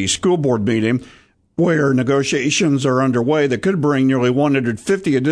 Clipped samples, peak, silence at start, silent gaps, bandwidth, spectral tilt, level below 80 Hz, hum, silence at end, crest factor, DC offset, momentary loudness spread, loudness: under 0.1%; -4 dBFS; 0 s; none; 11 kHz; -5.5 dB/octave; -52 dBFS; none; 0 s; 12 dB; under 0.1%; 4 LU; -17 LUFS